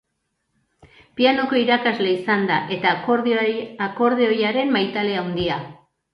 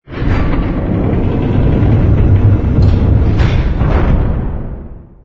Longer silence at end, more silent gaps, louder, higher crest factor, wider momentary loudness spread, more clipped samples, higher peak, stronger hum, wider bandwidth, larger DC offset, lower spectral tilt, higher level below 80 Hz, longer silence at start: first, 0.4 s vs 0.25 s; neither; second, -20 LUFS vs -13 LUFS; first, 18 dB vs 10 dB; about the same, 7 LU vs 7 LU; neither; second, -4 dBFS vs 0 dBFS; neither; about the same, 6.2 kHz vs 6 kHz; neither; second, -7 dB/octave vs -9.5 dB/octave; second, -56 dBFS vs -16 dBFS; first, 1.15 s vs 0.1 s